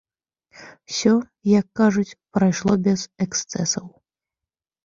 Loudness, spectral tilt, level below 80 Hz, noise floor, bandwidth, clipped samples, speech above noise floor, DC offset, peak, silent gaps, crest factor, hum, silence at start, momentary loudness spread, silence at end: -21 LUFS; -5 dB/octave; -56 dBFS; -89 dBFS; 7.6 kHz; under 0.1%; 68 dB; under 0.1%; -4 dBFS; none; 18 dB; none; 0.6 s; 6 LU; 1 s